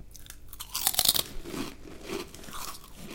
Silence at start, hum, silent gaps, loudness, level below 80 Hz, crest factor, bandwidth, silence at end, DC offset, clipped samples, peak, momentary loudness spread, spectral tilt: 0 s; none; none; -29 LUFS; -48 dBFS; 30 dB; 17.5 kHz; 0 s; under 0.1%; under 0.1%; -2 dBFS; 22 LU; -1 dB/octave